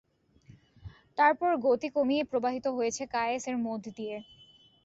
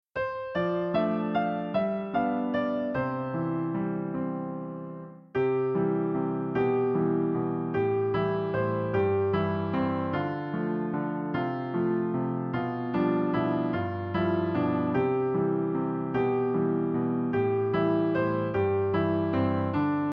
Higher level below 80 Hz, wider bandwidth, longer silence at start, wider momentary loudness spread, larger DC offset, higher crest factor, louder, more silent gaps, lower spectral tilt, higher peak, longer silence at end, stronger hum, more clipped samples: about the same, -64 dBFS vs -60 dBFS; first, 8.2 kHz vs 5.4 kHz; first, 0.85 s vs 0.15 s; first, 14 LU vs 5 LU; neither; first, 20 dB vs 14 dB; about the same, -30 LUFS vs -28 LUFS; neither; second, -4 dB/octave vs -10.5 dB/octave; first, -10 dBFS vs -14 dBFS; first, 0.6 s vs 0 s; neither; neither